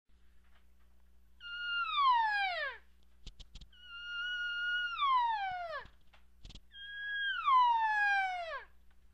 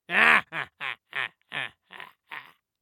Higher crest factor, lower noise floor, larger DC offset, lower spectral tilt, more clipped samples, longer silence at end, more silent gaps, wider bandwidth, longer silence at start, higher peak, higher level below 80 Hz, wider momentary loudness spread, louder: second, 16 dB vs 26 dB; first, -66 dBFS vs -48 dBFS; neither; second, -1 dB/octave vs -2.5 dB/octave; neither; about the same, 0.5 s vs 0.4 s; neither; second, 9.4 kHz vs 18.5 kHz; first, 1.4 s vs 0.1 s; second, -20 dBFS vs -2 dBFS; first, -62 dBFS vs -74 dBFS; second, 18 LU vs 25 LU; second, -33 LUFS vs -25 LUFS